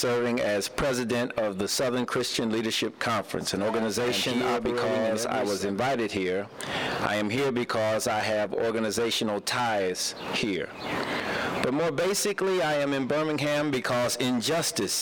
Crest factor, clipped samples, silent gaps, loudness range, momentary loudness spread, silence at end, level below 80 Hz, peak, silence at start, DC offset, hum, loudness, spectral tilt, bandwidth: 16 dB; under 0.1%; none; 1 LU; 3 LU; 0 s; -58 dBFS; -10 dBFS; 0 s; under 0.1%; none; -27 LUFS; -3.5 dB/octave; over 20 kHz